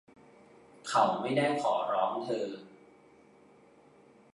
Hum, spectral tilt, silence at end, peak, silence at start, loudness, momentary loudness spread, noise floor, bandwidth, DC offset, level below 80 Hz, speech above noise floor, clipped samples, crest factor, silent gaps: none; -5 dB/octave; 1.65 s; -12 dBFS; 0.85 s; -30 LUFS; 12 LU; -60 dBFS; 11.5 kHz; under 0.1%; -80 dBFS; 30 dB; under 0.1%; 22 dB; none